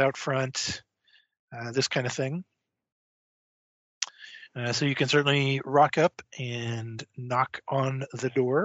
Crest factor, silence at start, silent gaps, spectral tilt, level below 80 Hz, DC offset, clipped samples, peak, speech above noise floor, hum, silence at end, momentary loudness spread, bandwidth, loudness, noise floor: 22 dB; 0 s; 1.39-1.48 s, 2.92-4.01 s; -4 dB/octave; -66 dBFS; under 0.1%; under 0.1%; -8 dBFS; 38 dB; none; 0 s; 16 LU; 8 kHz; -27 LUFS; -65 dBFS